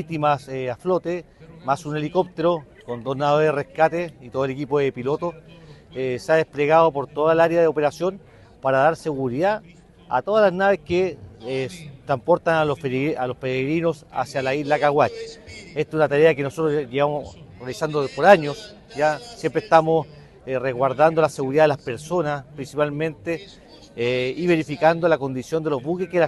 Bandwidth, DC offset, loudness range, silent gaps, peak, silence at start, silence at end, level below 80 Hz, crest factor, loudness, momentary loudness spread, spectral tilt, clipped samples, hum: 12 kHz; under 0.1%; 3 LU; none; 0 dBFS; 0 s; 0 s; -56 dBFS; 20 dB; -22 LUFS; 13 LU; -6.5 dB/octave; under 0.1%; none